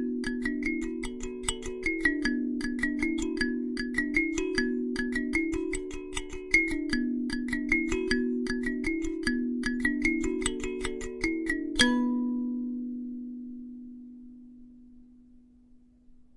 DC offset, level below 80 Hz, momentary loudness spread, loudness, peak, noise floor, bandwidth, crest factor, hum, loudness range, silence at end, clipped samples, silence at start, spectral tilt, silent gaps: under 0.1%; -44 dBFS; 12 LU; -30 LUFS; -8 dBFS; -58 dBFS; 11.5 kHz; 22 dB; none; 6 LU; 0.15 s; under 0.1%; 0 s; -3.5 dB/octave; none